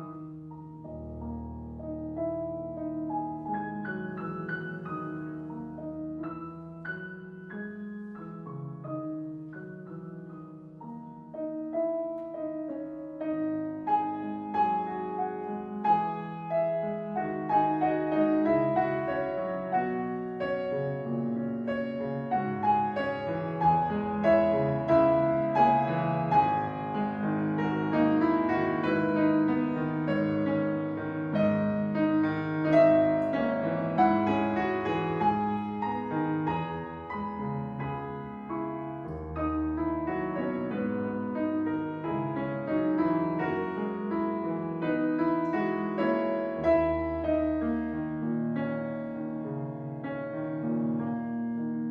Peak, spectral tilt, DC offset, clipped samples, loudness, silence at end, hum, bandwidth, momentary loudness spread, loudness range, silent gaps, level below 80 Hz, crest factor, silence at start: -10 dBFS; -9.5 dB/octave; under 0.1%; under 0.1%; -30 LUFS; 0 s; none; 5.6 kHz; 14 LU; 12 LU; none; -54 dBFS; 18 dB; 0 s